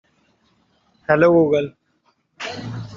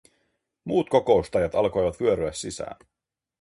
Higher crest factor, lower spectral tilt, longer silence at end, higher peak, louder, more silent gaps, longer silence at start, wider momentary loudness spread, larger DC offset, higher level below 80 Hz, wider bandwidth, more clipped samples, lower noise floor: about the same, 20 dB vs 20 dB; first, -7 dB/octave vs -5.5 dB/octave; second, 0 s vs 0.65 s; first, -2 dBFS vs -6 dBFS; first, -18 LUFS vs -24 LUFS; neither; first, 1.1 s vs 0.65 s; first, 18 LU vs 14 LU; neither; second, -56 dBFS vs -50 dBFS; second, 7.4 kHz vs 11.5 kHz; neither; second, -65 dBFS vs -73 dBFS